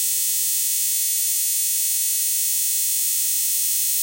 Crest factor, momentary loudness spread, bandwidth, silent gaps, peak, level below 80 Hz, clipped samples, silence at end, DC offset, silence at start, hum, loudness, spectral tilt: 12 dB; 0 LU; 16.5 kHz; none; -10 dBFS; -64 dBFS; under 0.1%; 0 s; under 0.1%; 0 s; none; -18 LUFS; 7 dB/octave